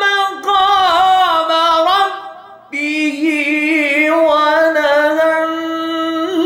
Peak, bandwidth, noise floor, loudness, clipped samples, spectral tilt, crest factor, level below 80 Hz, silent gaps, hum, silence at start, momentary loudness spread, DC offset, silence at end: -2 dBFS; 17 kHz; -34 dBFS; -13 LUFS; under 0.1%; -2.5 dB/octave; 12 dB; -54 dBFS; none; none; 0 s; 8 LU; under 0.1%; 0 s